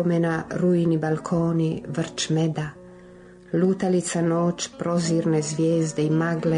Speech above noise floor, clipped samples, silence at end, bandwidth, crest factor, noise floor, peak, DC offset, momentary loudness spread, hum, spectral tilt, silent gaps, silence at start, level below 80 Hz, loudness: 24 dB; under 0.1%; 0 s; 10.5 kHz; 12 dB; -46 dBFS; -12 dBFS; under 0.1%; 6 LU; none; -6 dB/octave; none; 0 s; -58 dBFS; -23 LUFS